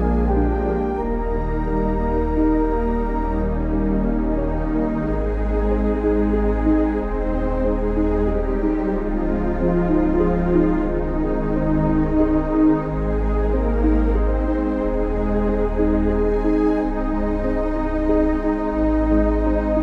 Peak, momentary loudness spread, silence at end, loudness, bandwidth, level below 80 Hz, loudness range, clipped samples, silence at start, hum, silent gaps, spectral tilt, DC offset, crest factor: -6 dBFS; 4 LU; 0 s; -21 LUFS; 4.8 kHz; -24 dBFS; 2 LU; under 0.1%; 0 s; none; none; -10 dB/octave; under 0.1%; 12 dB